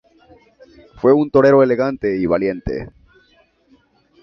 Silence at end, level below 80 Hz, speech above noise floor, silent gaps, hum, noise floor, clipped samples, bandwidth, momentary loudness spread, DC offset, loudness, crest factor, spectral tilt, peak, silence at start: 1.35 s; -44 dBFS; 41 dB; none; none; -56 dBFS; under 0.1%; 6.2 kHz; 14 LU; under 0.1%; -16 LUFS; 16 dB; -9 dB/octave; -2 dBFS; 1.05 s